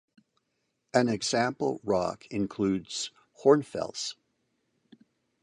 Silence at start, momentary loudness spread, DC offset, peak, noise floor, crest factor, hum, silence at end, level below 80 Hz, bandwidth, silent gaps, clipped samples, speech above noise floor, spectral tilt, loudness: 0.95 s; 11 LU; under 0.1%; -8 dBFS; -79 dBFS; 22 dB; none; 1.3 s; -64 dBFS; 11 kHz; none; under 0.1%; 51 dB; -4.5 dB/octave; -29 LUFS